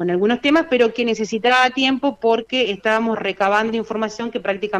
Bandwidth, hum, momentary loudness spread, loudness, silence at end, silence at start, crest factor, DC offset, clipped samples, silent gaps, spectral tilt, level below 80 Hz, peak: 10.5 kHz; none; 8 LU; -18 LUFS; 0 s; 0 s; 14 dB; under 0.1%; under 0.1%; none; -4.5 dB/octave; -58 dBFS; -4 dBFS